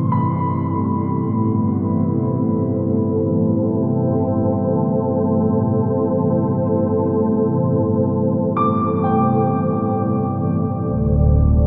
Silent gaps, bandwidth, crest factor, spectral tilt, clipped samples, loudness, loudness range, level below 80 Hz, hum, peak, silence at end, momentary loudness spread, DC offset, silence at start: none; 3.8 kHz; 12 dB; -15 dB/octave; under 0.1%; -18 LUFS; 1 LU; -30 dBFS; none; -4 dBFS; 0 s; 3 LU; under 0.1%; 0 s